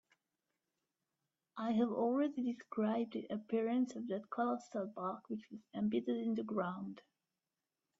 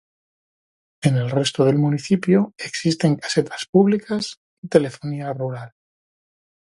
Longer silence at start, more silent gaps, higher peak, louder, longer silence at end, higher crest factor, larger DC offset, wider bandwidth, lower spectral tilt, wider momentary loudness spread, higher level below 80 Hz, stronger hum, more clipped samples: first, 1.55 s vs 1 s; second, none vs 3.69-3.73 s, 4.37-4.63 s; second, -24 dBFS vs 0 dBFS; second, -39 LUFS vs -21 LUFS; about the same, 1 s vs 0.95 s; about the same, 16 dB vs 20 dB; neither; second, 7.8 kHz vs 11.5 kHz; first, -7.5 dB/octave vs -6 dB/octave; about the same, 12 LU vs 10 LU; second, -84 dBFS vs -62 dBFS; neither; neither